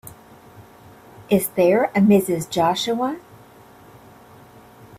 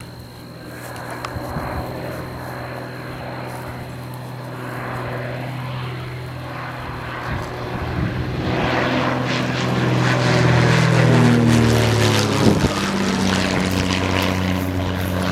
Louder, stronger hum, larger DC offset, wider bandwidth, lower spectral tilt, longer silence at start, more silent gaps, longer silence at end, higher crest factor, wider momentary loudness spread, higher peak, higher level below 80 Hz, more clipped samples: about the same, -19 LUFS vs -20 LUFS; neither; neither; about the same, 16 kHz vs 15.5 kHz; about the same, -5.5 dB/octave vs -5.5 dB/octave; about the same, 0.05 s vs 0 s; neither; first, 1.8 s vs 0 s; about the same, 16 dB vs 20 dB; second, 10 LU vs 16 LU; second, -6 dBFS vs 0 dBFS; second, -58 dBFS vs -38 dBFS; neither